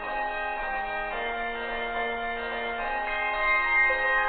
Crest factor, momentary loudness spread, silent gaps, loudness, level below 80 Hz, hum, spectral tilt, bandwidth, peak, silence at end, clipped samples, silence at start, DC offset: 14 dB; 9 LU; none; -27 LUFS; -46 dBFS; none; -6 dB/octave; 4.6 kHz; -14 dBFS; 0 s; under 0.1%; 0 s; under 0.1%